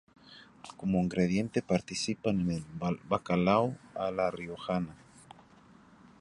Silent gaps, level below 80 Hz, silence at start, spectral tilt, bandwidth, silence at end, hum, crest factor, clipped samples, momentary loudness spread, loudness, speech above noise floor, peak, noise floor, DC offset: none; -58 dBFS; 0.3 s; -6 dB/octave; 11 kHz; 1.25 s; none; 22 dB; under 0.1%; 10 LU; -32 LUFS; 27 dB; -10 dBFS; -58 dBFS; under 0.1%